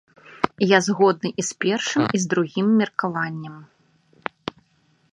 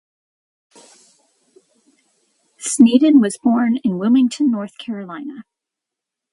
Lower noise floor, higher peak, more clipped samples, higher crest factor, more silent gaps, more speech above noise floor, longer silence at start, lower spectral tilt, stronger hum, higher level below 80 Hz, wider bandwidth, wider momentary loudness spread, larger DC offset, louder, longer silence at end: second, -63 dBFS vs -84 dBFS; about the same, 0 dBFS vs 0 dBFS; neither; about the same, 22 dB vs 18 dB; neither; second, 42 dB vs 69 dB; second, 0.3 s vs 2.6 s; about the same, -4.5 dB/octave vs -5 dB/octave; neither; about the same, -64 dBFS vs -68 dBFS; about the same, 11 kHz vs 11.5 kHz; about the same, 17 LU vs 17 LU; neither; second, -21 LUFS vs -16 LUFS; first, 1.5 s vs 0.9 s